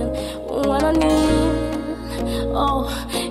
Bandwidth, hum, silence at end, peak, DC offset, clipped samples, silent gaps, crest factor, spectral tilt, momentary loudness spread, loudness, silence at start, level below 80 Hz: 15 kHz; none; 0 s; -4 dBFS; under 0.1%; under 0.1%; none; 16 dB; -5.5 dB/octave; 10 LU; -21 LUFS; 0 s; -30 dBFS